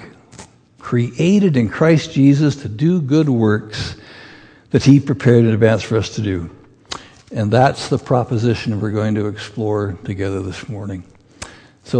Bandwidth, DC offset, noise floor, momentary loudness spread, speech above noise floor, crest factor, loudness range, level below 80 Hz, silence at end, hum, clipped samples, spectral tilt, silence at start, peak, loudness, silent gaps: 9.8 kHz; under 0.1%; -42 dBFS; 18 LU; 27 dB; 16 dB; 5 LU; -48 dBFS; 0 s; none; under 0.1%; -7 dB/octave; 0 s; 0 dBFS; -16 LUFS; none